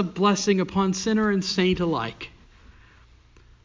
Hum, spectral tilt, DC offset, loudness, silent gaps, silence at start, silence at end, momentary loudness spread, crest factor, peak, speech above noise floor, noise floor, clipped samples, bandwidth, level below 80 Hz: none; -5 dB/octave; under 0.1%; -23 LUFS; none; 0 s; 1.35 s; 11 LU; 16 dB; -8 dBFS; 30 dB; -53 dBFS; under 0.1%; 7.6 kHz; -50 dBFS